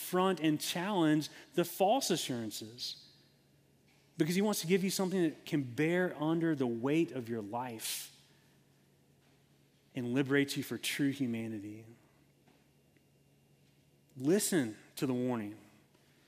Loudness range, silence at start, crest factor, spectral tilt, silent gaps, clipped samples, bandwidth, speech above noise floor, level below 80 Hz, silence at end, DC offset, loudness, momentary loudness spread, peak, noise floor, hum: 7 LU; 0 s; 18 dB; -4.5 dB/octave; none; under 0.1%; 16 kHz; 35 dB; -80 dBFS; 0.65 s; under 0.1%; -34 LUFS; 11 LU; -18 dBFS; -68 dBFS; none